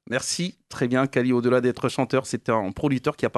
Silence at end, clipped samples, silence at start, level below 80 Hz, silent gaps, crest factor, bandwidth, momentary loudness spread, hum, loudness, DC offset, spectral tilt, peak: 0 s; under 0.1%; 0.1 s; -54 dBFS; none; 16 dB; 12.5 kHz; 6 LU; none; -24 LUFS; under 0.1%; -5 dB/octave; -6 dBFS